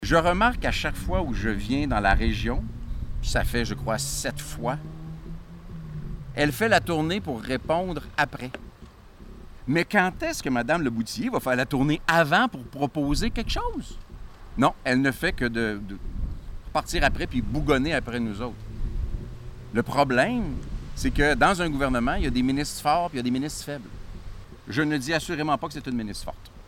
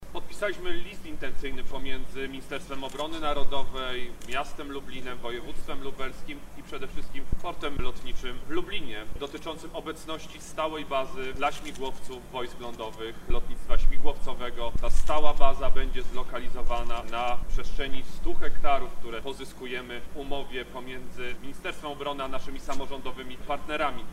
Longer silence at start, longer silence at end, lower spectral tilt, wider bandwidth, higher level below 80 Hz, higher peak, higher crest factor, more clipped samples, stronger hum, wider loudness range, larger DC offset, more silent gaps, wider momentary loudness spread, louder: about the same, 0 s vs 0 s; about the same, 0 s vs 0 s; about the same, -5 dB/octave vs -4.5 dB/octave; first, 17.5 kHz vs 9.4 kHz; about the same, -34 dBFS vs -32 dBFS; second, -8 dBFS vs -2 dBFS; about the same, 18 dB vs 20 dB; neither; neither; about the same, 4 LU vs 5 LU; neither; neither; first, 16 LU vs 9 LU; first, -26 LUFS vs -34 LUFS